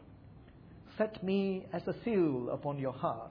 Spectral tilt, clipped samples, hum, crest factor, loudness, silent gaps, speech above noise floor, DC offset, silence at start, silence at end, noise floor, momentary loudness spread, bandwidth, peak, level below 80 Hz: -6.5 dB/octave; under 0.1%; none; 16 dB; -35 LUFS; none; 21 dB; under 0.1%; 0 s; 0 s; -55 dBFS; 7 LU; 5.2 kHz; -20 dBFS; -64 dBFS